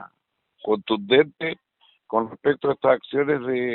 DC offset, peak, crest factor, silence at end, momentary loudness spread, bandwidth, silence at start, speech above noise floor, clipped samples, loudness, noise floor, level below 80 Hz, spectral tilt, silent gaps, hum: under 0.1%; -4 dBFS; 20 dB; 0 s; 11 LU; 4.2 kHz; 0 s; 52 dB; under 0.1%; -23 LUFS; -74 dBFS; -64 dBFS; -3 dB/octave; none; none